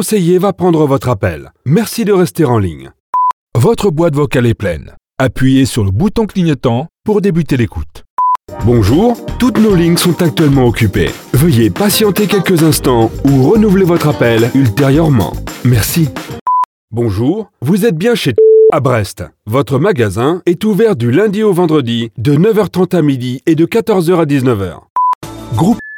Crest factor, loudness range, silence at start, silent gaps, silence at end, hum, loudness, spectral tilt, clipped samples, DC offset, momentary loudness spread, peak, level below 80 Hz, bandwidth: 10 dB; 3 LU; 0 s; 3.00-3.13 s, 3.33-3.47 s, 8.10-8.17 s, 16.41-16.46 s, 16.65-16.88 s, 24.90-24.96 s, 25.15-25.21 s; 0 s; none; -12 LUFS; -6.5 dB/octave; under 0.1%; under 0.1%; 8 LU; -2 dBFS; -32 dBFS; 19.5 kHz